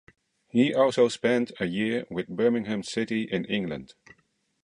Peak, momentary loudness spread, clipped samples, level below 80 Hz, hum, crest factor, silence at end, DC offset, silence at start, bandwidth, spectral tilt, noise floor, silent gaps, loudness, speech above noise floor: -8 dBFS; 8 LU; under 0.1%; -64 dBFS; none; 18 dB; 0.8 s; under 0.1%; 0.55 s; 11 kHz; -5.5 dB/octave; -68 dBFS; none; -26 LUFS; 42 dB